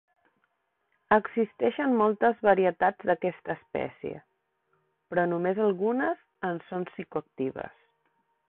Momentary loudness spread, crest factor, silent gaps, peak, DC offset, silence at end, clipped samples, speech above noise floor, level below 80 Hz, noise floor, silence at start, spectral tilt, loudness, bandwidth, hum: 13 LU; 22 dB; none; -8 dBFS; under 0.1%; 0.8 s; under 0.1%; 49 dB; -68 dBFS; -76 dBFS; 1.1 s; -10.5 dB/octave; -28 LUFS; 4.2 kHz; none